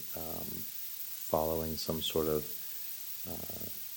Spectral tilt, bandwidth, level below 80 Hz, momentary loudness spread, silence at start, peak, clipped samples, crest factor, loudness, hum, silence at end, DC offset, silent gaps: -4 dB/octave; 17 kHz; -56 dBFS; 6 LU; 0 s; -14 dBFS; under 0.1%; 22 dB; -35 LUFS; none; 0 s; under 0.1%; none